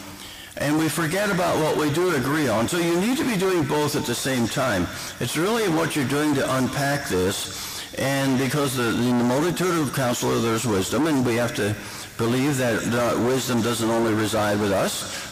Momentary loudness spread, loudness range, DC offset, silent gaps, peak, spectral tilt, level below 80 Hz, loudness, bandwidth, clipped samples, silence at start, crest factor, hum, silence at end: 5 LU; 1 LU; under 0.1%; none; -16 dBFS; -4.5 dB/octave; -52 dBFS; -22 LUFS; 16 kHz; under 0.1%; 0 s; 6 dB; none; 0 s